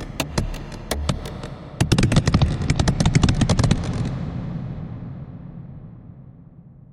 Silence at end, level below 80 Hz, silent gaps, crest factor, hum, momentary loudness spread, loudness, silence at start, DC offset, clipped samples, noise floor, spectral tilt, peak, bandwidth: 0 s; -30 dBFS; none; 20 dB; none; 20 LU; -22 LUFS; 0 s; under 0.1%; under 0.1%; -45 dBFS; -5.5 dB/octave; -2 dBFS; 16 kHz